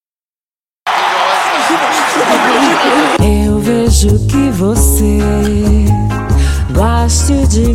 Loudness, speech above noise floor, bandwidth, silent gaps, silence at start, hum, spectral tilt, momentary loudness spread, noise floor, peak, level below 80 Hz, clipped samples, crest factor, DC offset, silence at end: -11 LUFS; over 81 dB; 16 kHz; none; 0.85 s; none; -5 dB/octave; 4 LU; under -90 dBFS; 0 dBFS; -16 dBFS; under 0.1%; 10 dB; under 0.1%; 0 s